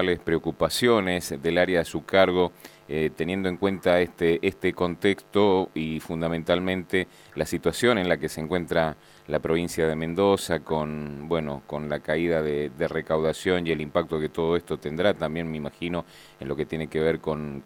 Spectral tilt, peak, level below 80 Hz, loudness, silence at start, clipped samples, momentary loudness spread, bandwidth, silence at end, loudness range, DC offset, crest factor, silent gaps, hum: -5.5 dB/octave; -4 dBFS; -50 dBFS; -26 LUFS; 0 s; under 0.1%; 9 LU; 18 kHz; 0.05 s; 3 LU; under 0.1%; 22 dB; none; none